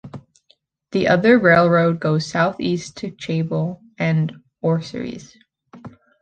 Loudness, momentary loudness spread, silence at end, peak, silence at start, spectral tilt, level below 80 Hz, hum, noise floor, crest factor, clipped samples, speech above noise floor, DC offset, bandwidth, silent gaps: -19 LUFS; 17 LU; 0.3 s; -2 dBFS; 0.05 s; -7 dB/octave; -56 dBFS; none; -61 dBFS; 18 dB; under 0.1%; 43 dB; under 0.1%; 9 kHz; none